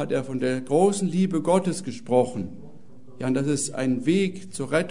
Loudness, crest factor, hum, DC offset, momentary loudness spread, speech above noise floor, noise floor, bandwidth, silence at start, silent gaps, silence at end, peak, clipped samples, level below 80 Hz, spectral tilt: -24 LUFS; 18 dB; none; 1%; 11 LU; 25 dB; -49 dBFS; 11 kHz; 0 s; none; 0 s; -6 dBFS; under 0.1%; -62 dBFS; -5.5 dB/octave